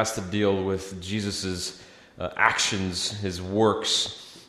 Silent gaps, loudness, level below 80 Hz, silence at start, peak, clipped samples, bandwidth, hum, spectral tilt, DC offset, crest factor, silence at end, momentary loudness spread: none; -26 LUFS; -58 dBFS; 0 s; -2 dBFS; under 0.1%; 14 kHz; none; -3.5 dB/octave; under 0.1%; 24 dB; 0.05 s; 11 LU